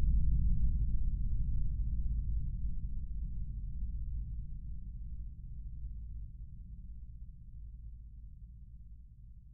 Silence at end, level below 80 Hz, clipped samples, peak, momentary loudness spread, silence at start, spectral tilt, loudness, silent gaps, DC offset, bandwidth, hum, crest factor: 0 s; -36 dBFS; under 0.1%; -20 dBFS; 19 LU; 0 s; -22.5 dB/octave; -41 LUFS; none; under 0.1%; 0.5 kHz; none; 16 dB